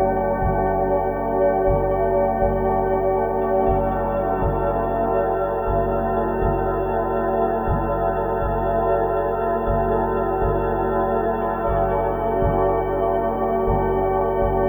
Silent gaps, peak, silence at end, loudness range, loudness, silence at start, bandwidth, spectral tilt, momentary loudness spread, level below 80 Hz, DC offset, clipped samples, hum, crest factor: none; -8 dBFS; 0 s; 1 LU; -21 LUFS; 0 s; over 20 kHz; -10.5 dB/octave; 3 LU; -30 dBFS; under 0.1%; under 0.1%; none; 14 dB